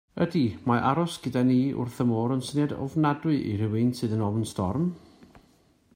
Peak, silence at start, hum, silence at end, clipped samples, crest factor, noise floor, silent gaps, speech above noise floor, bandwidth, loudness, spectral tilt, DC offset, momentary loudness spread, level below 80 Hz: -8 dBFS; 0.15 s; none; 0.55 s; under 0.1%; 18 dB; -62 dBFS; none; 36 dB; 16 kHz; -27 LUFS; -7 dB/octave; under 0.1%; 5 LU; -60 dBFS